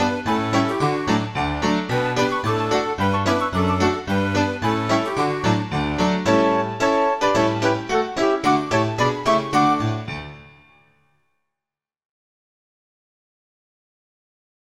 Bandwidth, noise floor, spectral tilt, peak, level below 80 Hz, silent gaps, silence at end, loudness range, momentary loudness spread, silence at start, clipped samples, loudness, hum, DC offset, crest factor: 15 kHz; -88 dBFS; -5.5 dB/octave; -6 dBFS; -46 dBFS; none; 4.2 s; 4 LU; 4 LU; 0 s; under 0.1%; -20 LUFS; none; 0.2%; 16 dB